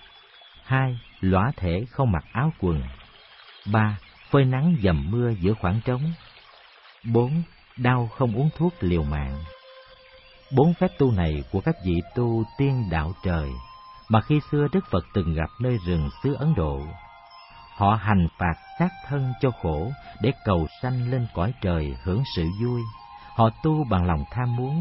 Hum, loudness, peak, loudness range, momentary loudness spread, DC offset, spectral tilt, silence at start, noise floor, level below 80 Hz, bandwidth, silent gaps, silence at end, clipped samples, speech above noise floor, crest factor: none; -25 LUFS; -6 dBFS; 2 LU; 9 LU; under 0.1%; -12 dB/octave; 0.65 s; -51 dBFS; -38 dBFS; 5.8 kHz; none; 0 s; under 0.1%; 28 dB; 18 dB